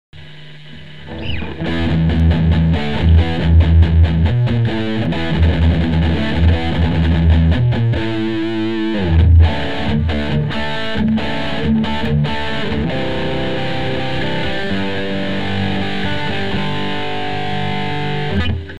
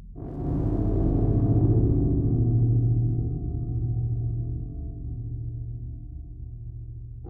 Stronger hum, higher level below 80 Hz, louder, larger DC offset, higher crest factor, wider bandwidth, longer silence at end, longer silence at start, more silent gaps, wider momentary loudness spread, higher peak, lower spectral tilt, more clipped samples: neither; first, -22 dBFS vs -32 dBFS; first, -17 LUFS vs -26 LUFS; first, 6% vs under 0.1%; about the same, 14 dB vs 14 dB; first, 7.4 kHz vs 1.7 kHz; about the same, 0 s vs 0 s; about the same, 0.1 s vs 0 s; neither; second, 8 LU vs 17 LU; first, -2 dBFS vs -10 dBFS; second, -8 dB/octave vs -14 dB/octave; neither